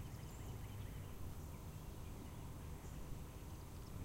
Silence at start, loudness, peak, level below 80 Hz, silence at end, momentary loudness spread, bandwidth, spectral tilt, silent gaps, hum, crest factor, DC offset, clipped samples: 0 s; -52 LUFS; -36 dBFS; -54 dBFS; 0 s; 2 LU; 16 kHz; -5.5 dB/octave; none; none; 14 dB; under 0.1%; under 0.1%